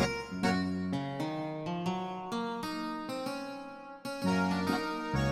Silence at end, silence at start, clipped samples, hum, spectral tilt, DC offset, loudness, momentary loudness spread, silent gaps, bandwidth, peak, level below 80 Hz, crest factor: 0 s; 0 s; under 0.1%; none; -6 dB/octave; under 0.1%; -34 LUFS; 10 LU; none; 15.5 kHz; -14 dBFS; -54 dBFS; 20 dB